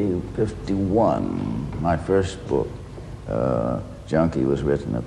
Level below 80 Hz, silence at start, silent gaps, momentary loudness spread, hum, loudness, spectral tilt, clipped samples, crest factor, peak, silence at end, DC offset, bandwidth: -38 dBFS; 0 s; none; 10 LU; none; -24 LUFS; -8 dB/octave; under 0.1%; 16 dB; -6 dBFS; 0 s; under 0.1%; 11.5 kHz